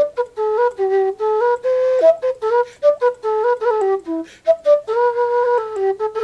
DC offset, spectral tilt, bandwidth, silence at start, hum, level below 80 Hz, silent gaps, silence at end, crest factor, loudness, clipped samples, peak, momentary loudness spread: under 0.1%; -4.5 dB/octave; 8.4 kHz; 0 s; none; -62 dBFS; none; 0 s; 14 dB; -18 LUFS; under 0.1%; -4 dBFS; 5 LU